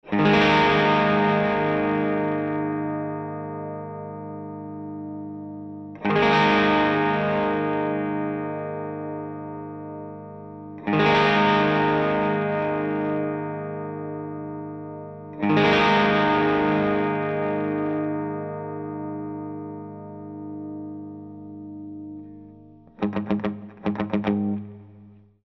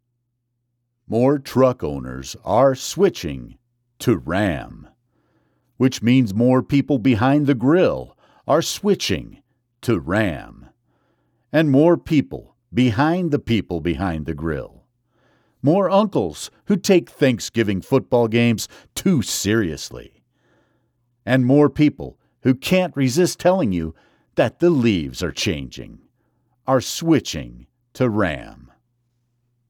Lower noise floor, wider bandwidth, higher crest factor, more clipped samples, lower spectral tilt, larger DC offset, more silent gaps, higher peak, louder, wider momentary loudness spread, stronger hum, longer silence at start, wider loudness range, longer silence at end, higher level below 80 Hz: second, -49 dBFS vs -73 dBFS; second, 6.6 kHz vs 18 kHz; about the same, 18 dB vs 16 dB; neither; about the same, -7 dB/octave vs -6 dB/octave; neither; neither; about the same, -6 dBFS vs -4 dBFS; second, -23 LUFS vs -19 LUFS; first, 19 LU vs 14 LU; first, 50 Hz at -60 dBFS vs none; second, 0.05 s vs 1.1 s; first, 12 LU vs 5 LU; second, 0.3 s vs 1.2 s; second, -54 dBFS vs -46 dBFS